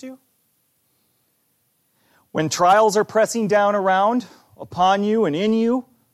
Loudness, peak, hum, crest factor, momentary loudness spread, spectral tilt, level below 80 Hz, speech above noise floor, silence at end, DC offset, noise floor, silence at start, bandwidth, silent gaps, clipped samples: -19 LUFS; -6 dBFS; none; 16 dB; 10 LU; -4.5 dB/octave; -68 dBFS; 48 dB; 0.3 s; under 0.1%; -67 dBFS; 0.05 s; 14.5 kHz; none; under 0.1%